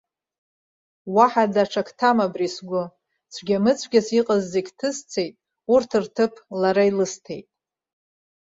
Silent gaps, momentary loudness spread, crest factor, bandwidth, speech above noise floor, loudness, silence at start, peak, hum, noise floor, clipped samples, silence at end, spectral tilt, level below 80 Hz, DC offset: none; 16 LU; 20 dB; 7.8 kHz; over 69 dB; -22 LUFS; 1.05 s; -2 dBFS; none; under -90 dBFS; under 0.1%; 1.05 s; -5 dB/octave; -66 dBFS; under 0.1%